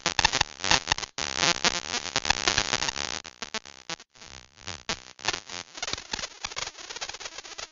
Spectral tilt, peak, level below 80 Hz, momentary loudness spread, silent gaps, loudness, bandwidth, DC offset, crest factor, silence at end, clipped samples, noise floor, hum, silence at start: -0.5 dB/octave; 0 dBFS; -50 dBFS; 15 LU; none; -28 LUFS; 10.5 kHz; under 0.1%; 30 dB; 0.05 s; under 0.1%; -49 dBFS; none; 0.05 s